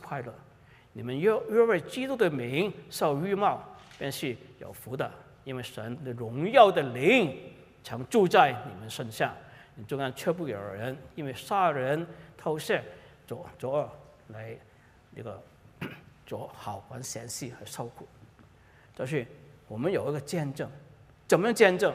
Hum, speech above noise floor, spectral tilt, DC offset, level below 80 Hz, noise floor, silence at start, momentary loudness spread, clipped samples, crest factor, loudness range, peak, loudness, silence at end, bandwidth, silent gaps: none; 29 dB; -5 dB/octave; under 0.1%; -66 dBFS; -57 dBFS; 0 s; 21 LU; under 0.1%; 24 dB; 15 LU; -6 dBFS; -29 LUFS; 0 s; 15.5 kHz; none